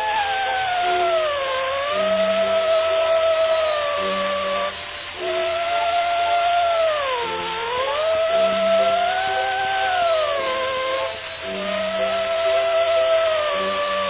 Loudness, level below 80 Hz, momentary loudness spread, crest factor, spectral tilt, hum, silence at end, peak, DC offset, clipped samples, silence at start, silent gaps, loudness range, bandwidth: -21 LUFS; -52 dBFS; 6 LU; 12 dB; -7 dB/octave; none; 0 s; -8 dBFS; under 0.1%; under 0.1%; 0 s; none; 2 LU; 4 kHz